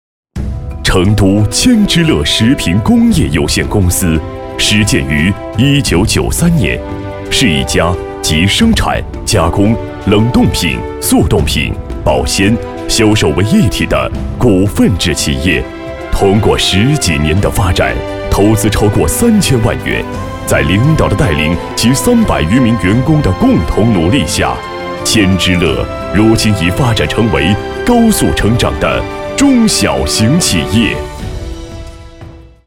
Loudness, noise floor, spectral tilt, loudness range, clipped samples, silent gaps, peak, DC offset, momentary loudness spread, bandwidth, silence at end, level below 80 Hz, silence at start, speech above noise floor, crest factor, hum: -11 LUFS; -32 dBFS; -5 dB/octave; 1 LU; 0.1%; none; 0 dBFS; 0.4%; 8 LU; 17.5 kHz; 0.25 s; -22 dBFS; 0.35 s; 22 dB; 10 dB; none